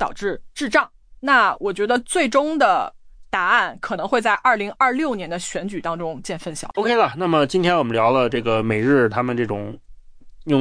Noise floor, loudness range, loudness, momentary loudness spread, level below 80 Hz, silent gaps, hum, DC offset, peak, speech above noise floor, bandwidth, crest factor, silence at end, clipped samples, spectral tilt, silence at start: -41 dBFS; 2 LU; -20 LUFS; 11 LU; -48 dBFS; none; none; under 0.1%; -4 dBFS; 21 dB; 10.5 kHz; 16 dB; 0 s; under 0.1%; -5 dB/octave; 0 s